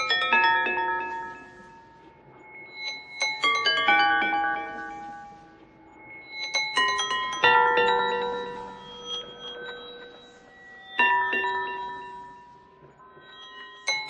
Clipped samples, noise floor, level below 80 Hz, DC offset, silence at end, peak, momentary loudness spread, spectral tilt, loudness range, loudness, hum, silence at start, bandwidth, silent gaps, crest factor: under 0.1%; -52 dBFS; -66 dBFS; under 0.1%; 0 s; -6 dBFS; 24 LU; -1 dB/octave; 5 LU; -24 LUFS; none; 0 s; 10 kHz; none; 22 dB